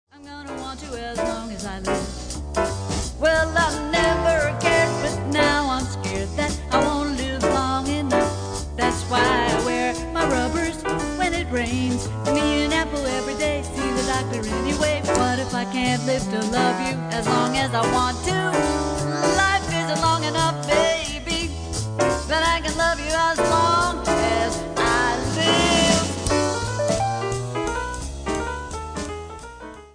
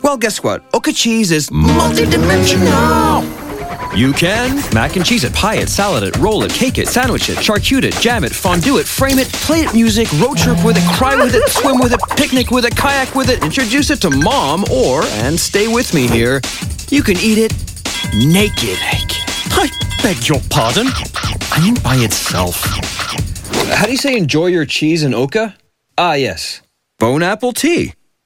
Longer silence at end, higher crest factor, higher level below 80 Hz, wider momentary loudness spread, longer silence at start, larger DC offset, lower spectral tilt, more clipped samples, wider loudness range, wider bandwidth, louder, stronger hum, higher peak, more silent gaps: second, 0.05 s vs 0.35 s; about the same, 18 dB vs 14 dB; second, -36 dBFS vs -30 dBFS; about the same, 9 LU vs 7 LU; first, 0.15 s vs 0 s; neither; about the same, -4 dB/octave vs -4 dB/octave; neither; about the same, 3 LU vs 3 LU; second, 10.5 kHz vs 17 kHz; second, -22 LUFS vs -13 LUFS; neither; second, -4 dBFS vs 0 dBFS; neither